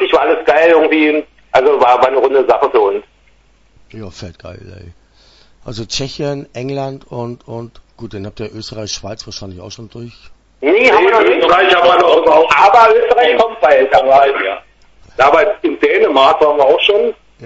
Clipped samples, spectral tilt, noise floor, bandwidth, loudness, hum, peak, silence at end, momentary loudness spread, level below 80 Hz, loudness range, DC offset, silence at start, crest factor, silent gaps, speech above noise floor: under 0.1%; -4.5 dB/octave; -50 dBFS; 8 kHz; -11 LUFS; none; 0 dBFS; 0 s; 21 LU; -46 dBFS; 17 LU; under 0.1%; 0 s; 12 dB; none; 38 dB